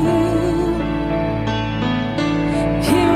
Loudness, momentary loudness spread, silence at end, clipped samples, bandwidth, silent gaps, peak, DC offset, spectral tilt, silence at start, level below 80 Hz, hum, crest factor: -19 LUFS; 4 LU; 0 s; under 0.1%; 15.5 kHz; none; -4 dBFS; under 0.1%; -6.5 dB/octave; 0 s; -32 dBFS; none; 14 dB